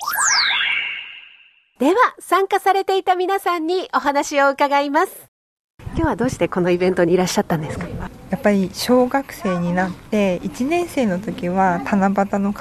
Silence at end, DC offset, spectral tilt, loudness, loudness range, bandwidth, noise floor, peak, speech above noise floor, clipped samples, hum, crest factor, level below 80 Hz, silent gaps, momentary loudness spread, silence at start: 0 s; under 0.1%; -4.5 dB/octave; -19 LUFS; 2 LU; 13.5 kHz; -51 dBFS; -4 dBFS; 32 dB; under 0.1%; none; 14 dB; -44 dBFS; 5.28-5.78 s; 8 LU; 0 s